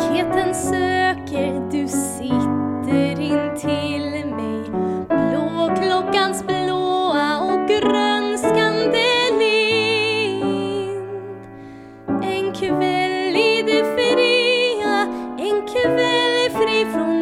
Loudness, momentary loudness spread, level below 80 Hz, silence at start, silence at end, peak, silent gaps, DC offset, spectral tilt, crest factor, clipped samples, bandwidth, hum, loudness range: -19 LUFS; 9 LU; -52 dBFS; 0 s; 0 s; -4 dBFS; none; under 0.1%; -4.5 dB/octave; 16 dB; under 0.1%; 15.5 kHz; none; 4 LU